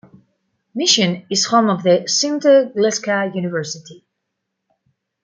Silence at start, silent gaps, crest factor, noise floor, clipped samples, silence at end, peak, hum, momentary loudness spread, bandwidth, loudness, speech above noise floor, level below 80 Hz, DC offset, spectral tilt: 0.75 s; none; 18 dB; -76 dBFS; under 0.1%; 1.3 s; -2 dBFS; none; 11 LU; 9.6 kHz; -16 LUFS; 60 dB; -68 dBFS; under 0.1%; -3.5 dB/octave